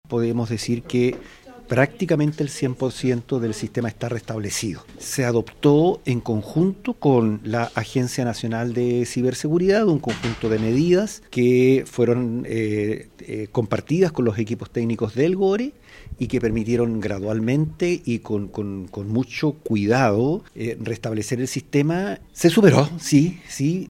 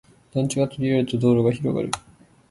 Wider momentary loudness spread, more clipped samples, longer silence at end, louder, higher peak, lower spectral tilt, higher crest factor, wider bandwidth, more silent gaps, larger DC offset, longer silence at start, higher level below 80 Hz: about the same, 9 LU vs 10 LU; neither; second, 0.05 s vs 0.5 s; about the same, -22 LUFS vs -23 LUFS; first, 0 dBFS vs -6 dBFS; about the same, -6.5 dB/octave vs -6.5 dB/octave; first, 22 dB vs 16 dB; first, 16 kHz vs 11.5 kHz; neither; neither; second, 0.1 s vs 0.35 s; first, -48 dBFS vs -54 dBFS